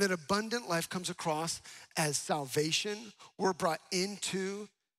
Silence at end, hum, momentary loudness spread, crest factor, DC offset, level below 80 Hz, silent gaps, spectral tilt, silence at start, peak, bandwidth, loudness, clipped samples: 0.3 s; none; 9 LU; 18 dB; under 0.1%; -72 dBFS; none; -3 dB/octave; 0 s; -16 dBFS; 16 kHz; -34 LUFS; under 0.1%